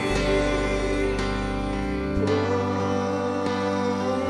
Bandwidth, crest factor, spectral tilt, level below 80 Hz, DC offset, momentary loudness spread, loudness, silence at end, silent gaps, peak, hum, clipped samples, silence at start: 12 kHz; 14 dB; -6 dB/octave; -34 dBFS; under 0.1%; 4 LU; -25 LUFS; 0 s; none; -10 dBFS; none; under 0.1%; 0 s